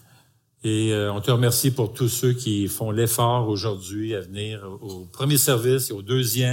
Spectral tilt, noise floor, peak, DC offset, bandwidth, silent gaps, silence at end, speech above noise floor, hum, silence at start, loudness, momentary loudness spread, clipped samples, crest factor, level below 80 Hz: -4.5 dB/octave; -58 dBFS; -6 dBFS; under 0.1%; 17 kHz; none; 0 s; 36 dB; none; 0.65 s; -22 LUFS; 12 LU; under 0.1%; 18 dB; -60 dBFS